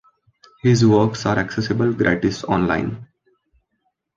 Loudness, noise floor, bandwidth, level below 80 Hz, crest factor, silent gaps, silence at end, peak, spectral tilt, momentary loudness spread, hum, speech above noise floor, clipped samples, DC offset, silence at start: -19 LUFS; -72 dBFS; 7.6 kHz; -46 dBFS; 18 dB; none; 1.1 s; -2 dBFS; -6.5 dB/octave; 8 LU; none; 54 dB; under 0.1%; under 0.1%; 0.65 s